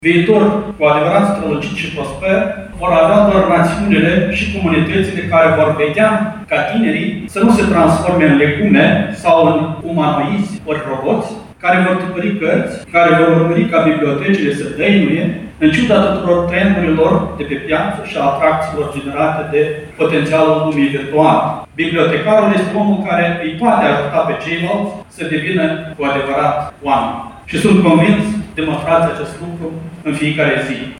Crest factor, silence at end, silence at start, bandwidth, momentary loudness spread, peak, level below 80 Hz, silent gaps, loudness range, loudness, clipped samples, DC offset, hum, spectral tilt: 14 dB; 0 s; 0 s; 12 kHz; 9 LU; 0 dBFS; -40 dBFS; none; 4 LU; -13 LUFS; under 0.1%; under 0.1%; none; -7 dB/octave